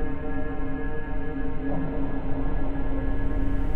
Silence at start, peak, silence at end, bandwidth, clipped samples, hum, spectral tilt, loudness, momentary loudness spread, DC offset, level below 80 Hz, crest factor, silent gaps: 0 s; -12 dBFS; 0 s; 3.2 kHz; under 0.1%; none; -10 dB/octave; -31 LUFS; 3 LU; under 0.1%; -28 dBFS; 10 dB; none